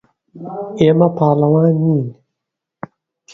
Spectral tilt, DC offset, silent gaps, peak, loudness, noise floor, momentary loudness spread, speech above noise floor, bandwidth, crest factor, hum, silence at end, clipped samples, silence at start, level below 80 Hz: -9.5 dB/octave; under 0.1%; none; 0 dBFS; -14 LUFS; -80 dBFS; 23 LU; 67 dB; 7 kHz; 16 dB; none; 1.2 s; under 0.1%; 0.35 s; -54 dBFS